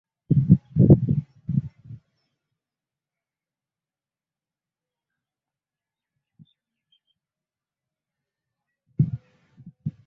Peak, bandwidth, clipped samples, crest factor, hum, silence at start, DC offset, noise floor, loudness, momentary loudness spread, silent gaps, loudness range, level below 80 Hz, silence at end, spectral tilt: -2 dBFS; 1.2 kHz; under 0.1%; 24 dB; none; 0.3 s; under 0.1%; under -90 dBFS; -21 LUFS; 21 LU; none; 14 LU; -48 dBFS; 0.15 s; -14 dB/octave